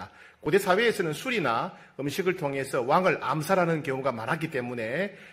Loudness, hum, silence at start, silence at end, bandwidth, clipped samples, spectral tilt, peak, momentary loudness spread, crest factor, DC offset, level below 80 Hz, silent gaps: -27 LUFS; none; 0 s; 0 s; 16 kHz; under 0.1%; -5.5 dB/octave; -8 dBFS; 8 LU; 18 dB; under 0.1%; -66 dBFS; none